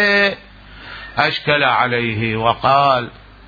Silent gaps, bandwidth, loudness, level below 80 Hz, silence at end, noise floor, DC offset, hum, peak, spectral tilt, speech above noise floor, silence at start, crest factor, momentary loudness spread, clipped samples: none; 5 kHz; -16 LUFS; -46 dBFS; 0.3 s; -36 dBFS; under 0.1%; none; 0 dBFS; -6 dB/octave; 20 dB; 0 s; 18 dB; 19 LU; under 0.1%